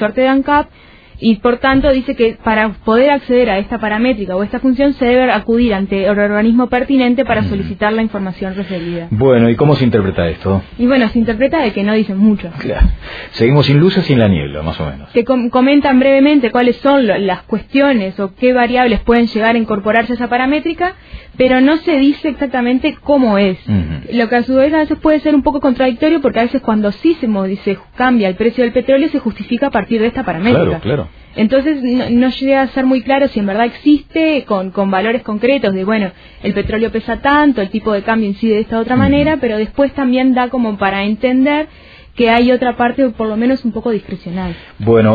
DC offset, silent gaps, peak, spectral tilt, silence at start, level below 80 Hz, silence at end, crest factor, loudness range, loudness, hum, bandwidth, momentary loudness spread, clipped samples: under 0.1%; none; 0 dBFS; -9 dB/octave; 0 s; -32 dBFS; 0 s; 12 dB; 3 LU; -13 LUFS; none; 5 kHz; 8 LU; under 0.1%